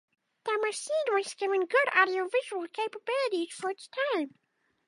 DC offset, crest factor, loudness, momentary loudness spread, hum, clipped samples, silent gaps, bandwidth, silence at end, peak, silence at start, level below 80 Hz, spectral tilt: under 0.1%; 22 dB; -29 LUFS; 11 LU; none; under 0.1%; none; 11.5 kHz; 0.6 s; -10 dBFS; 0.45 s; under -90 dBFS; -1.5 dB/octave